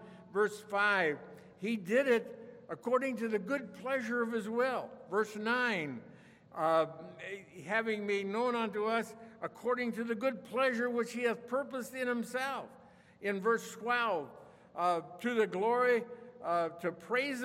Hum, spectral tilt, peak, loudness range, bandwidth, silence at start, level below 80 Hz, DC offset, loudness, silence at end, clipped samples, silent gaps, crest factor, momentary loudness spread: none; -5 dB/octave; -16 dBFS; 2 LU; 16 kHz; 0 s; -82 dBFS; under 0.1%; -34 LUFS; 0 s; under 0.1%; none; 18 dB; 14 LU